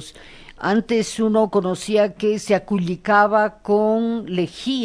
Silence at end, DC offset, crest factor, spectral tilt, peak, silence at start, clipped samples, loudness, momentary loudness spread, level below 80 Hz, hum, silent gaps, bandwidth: 0 s; under 0.1%; 18 dB; -5.5 dB/octave; -2 dBFS; 0 s; under 0.1%; -20 LUFS; 7 LU; -52 dBFS; none; none; 11 kHz